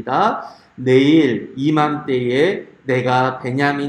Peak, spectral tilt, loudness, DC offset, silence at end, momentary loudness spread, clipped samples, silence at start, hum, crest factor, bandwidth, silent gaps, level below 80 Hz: 0 dBFS; -7 dB/octave; -17 LUFS; under 0.1%; 0 s; 10 LU; under 0.1%; 0 s; none; 16 dB; 10 kHz; none; -60 dBFS